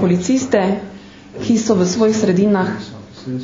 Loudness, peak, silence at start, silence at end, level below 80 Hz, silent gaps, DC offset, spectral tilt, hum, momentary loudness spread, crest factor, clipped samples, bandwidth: -16 LUFS; 0 dBFS; 0 s; 0 s; -50 dBFS; none; under 0.1%; -6 dB/octave; none; 18 LU; 16 dB; under 0.1%; 7.6 kHz